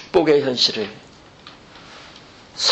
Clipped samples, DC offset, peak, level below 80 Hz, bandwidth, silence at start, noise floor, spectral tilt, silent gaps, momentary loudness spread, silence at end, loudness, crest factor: under 0.1%; under 0.1%; -4 dBFS; -56 dBFS; 8.6 kHz; 0 s; -44 dBFS; -3 dB/octave; none; 25 LU; 0 s; -18 LUFS; 18 dB